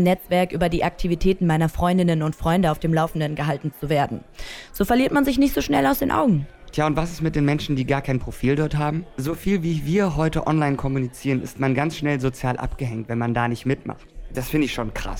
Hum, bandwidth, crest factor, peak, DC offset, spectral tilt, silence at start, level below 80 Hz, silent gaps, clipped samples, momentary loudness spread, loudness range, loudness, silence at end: none; 17.5 kHz; 16 dB; -6 dBFS; under 0.1%; -6.5 dB/octave; 0 s; -36 dBFS; none; under 0.1%; 8 LU; 3 LU; -22 LUFS; 0 s